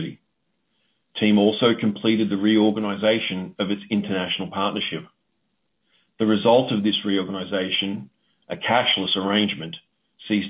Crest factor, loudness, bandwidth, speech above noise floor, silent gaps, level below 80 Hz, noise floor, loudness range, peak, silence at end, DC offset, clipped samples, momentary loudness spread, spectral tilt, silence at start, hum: 18 dB; -22 LUFS; 3.9 kHz; 53 dB; none; -62 dBFS; -74 dBFS; 4 LU; -4 dBFS; 0 s; under 0.1%; under 0.1%; 13 LU; -9.5 dB/octave; 0 s; none